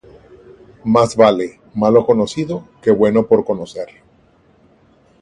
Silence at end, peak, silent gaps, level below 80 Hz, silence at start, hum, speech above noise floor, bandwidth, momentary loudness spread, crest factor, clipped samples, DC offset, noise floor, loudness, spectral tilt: 1.35 s; 0 dBFS; none; -52 dBFS; 0.85 s; none; 38 dB; 11 kHz; 14 LU; 16 dB; under 0.1%; under 0.1%; -52 dBFS; -15 LUFS; -6.5 dB/octave